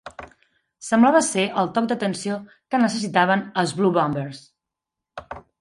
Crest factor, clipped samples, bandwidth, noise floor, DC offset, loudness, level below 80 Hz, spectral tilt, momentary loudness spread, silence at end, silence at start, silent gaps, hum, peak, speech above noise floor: 18 dB; under 0.1%; 11.5 kHz; -85 dBFS; under 0.1%; -21 LUFS; -60 dBFS; -4.5 dB/octave; 22 LU; 0.2 s; 0.05 s; none; none; -4 dBFS; 64 dB